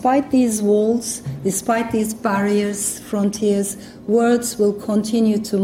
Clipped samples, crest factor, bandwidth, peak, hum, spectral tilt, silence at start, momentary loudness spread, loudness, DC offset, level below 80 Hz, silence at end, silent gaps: under 0.1%; 12 dB; 16.5 kHz; -6 dBFS; none; -5 dB/octave; 0 s; 6 LU; -19 LUFS; under 0.1%; -52 dBFS; 0 s; none